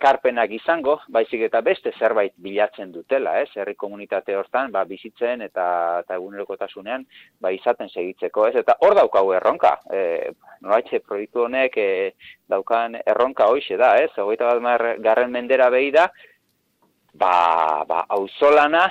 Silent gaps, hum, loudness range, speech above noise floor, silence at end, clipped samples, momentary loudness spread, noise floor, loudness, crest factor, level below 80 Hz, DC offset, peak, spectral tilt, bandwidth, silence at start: none; none; 6 LU; 46 dB; 0 s; under 0.1%; 12 LU; -66 dBFS; -20 LUFS; 16 dB; -66 dBFS; under 0.1%; -4 dBFS; -5 dB/octave; 8 kHz; 0 s